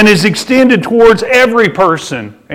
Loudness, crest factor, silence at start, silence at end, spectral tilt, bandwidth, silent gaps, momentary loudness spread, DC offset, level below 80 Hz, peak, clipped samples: -8 LUFS; 8 dB; 0 s; 0 s; -5 dB/octave; 16 kHz; none; 9 LU; under 0.1%; -40 dBFS; 0 dBFS; 0.2%